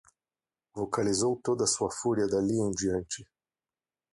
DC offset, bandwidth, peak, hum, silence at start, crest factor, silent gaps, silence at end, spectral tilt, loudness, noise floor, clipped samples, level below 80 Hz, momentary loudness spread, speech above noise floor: under 0.1%; 11.5 kHz; -14 dBFS; none; 0.75 s; 16 dB; none; 0.9 s; -4.5 dB/octave; -29 LUFS; under -90 dBFS; under 0.1%; -58 dBFS; 11 LU; over 61 dB